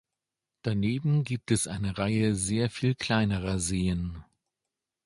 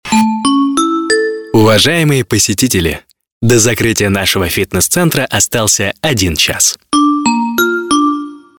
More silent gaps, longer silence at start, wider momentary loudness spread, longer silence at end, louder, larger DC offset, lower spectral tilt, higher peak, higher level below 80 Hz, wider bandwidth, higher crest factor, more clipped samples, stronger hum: second, none vs 3.32-3.41 s; first, 0.65 s vs 0.05 s; about the same, 6 LU vs 4 LU; first, 0.8 s vs 0.2 s; second, -28 LUFS vs -11 LUFS; neither; first, -5.5 dB/octave vs -3.5 dB/octave; second, -10 dBFS vs 0 dBFS; second, -46 dBFS vs -36 dBFS; second, 11.5 kHz vs 19 kHz; first, 18 dB vs 12 dB; neither; neither